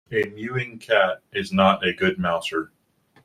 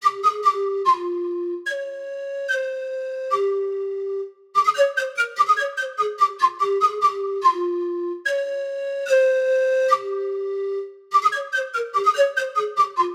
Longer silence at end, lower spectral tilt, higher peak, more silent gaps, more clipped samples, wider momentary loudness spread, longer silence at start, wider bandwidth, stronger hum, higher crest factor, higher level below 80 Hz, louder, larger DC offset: first, 0.6 s vs 0 s; first, -5.5 dB/octave vs -2 dB/octave; about the same, -4 dBFS vs -6 dBFS; neither; neither; about the same, 10 LU vs 9 LU; about the same, 0.1 s vs 0 s; about the same, 13.5 kHz vs 14 kHz; neither; about the same, 20 dB vs 16 dB; first, -60 dBFS vs -80 dBFS; about the same, -23 LUFS vs -22 LUFS; neither